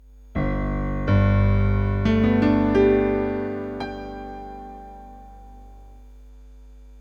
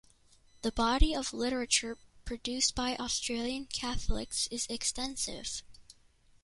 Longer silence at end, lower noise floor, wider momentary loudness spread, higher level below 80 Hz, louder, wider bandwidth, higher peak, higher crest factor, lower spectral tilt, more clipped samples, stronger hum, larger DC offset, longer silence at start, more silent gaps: second, 0 s vs 0.5 s; second, -44 dBFS vs -64 dBFS; first, 20 LU vs 10 LU; first, -32 dBFS vs -40 dBFS; first, -22 LUFS vs -33 LUFS; second, 6.8 kHz vs 11.5 kHz; first, -6 dBFS vs -10 dBFS; second, 16 dB vs 24 dB; first, -9.5 dB/octave vs -2.5 dB/octave; neither; first, 50 Hz at -40 dBFS vs none; neither; second, 0.2 s vs 0.65 s; neither